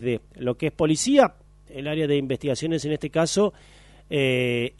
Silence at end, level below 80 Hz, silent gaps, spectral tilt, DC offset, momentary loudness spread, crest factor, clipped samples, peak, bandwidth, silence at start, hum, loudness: 0.1 s; -52 dBFS; none; -5 dB/octave; under 0.1%; 10 LU; 20 dB; under 0.1%; -4 dBFS; 11.5 kHz; 0 s; 50 Hz at -50 dBFS; -23 LUFS